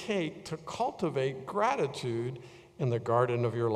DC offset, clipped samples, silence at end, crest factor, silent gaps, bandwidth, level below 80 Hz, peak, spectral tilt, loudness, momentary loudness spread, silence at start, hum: under 0.1%; under 0.1%; 0 s; 18 dB; none; 12 kHz; -68 dBFS; -12 dBFS; -6.5 dB/octave; -32 LUFS; 11 LU; 0 s; none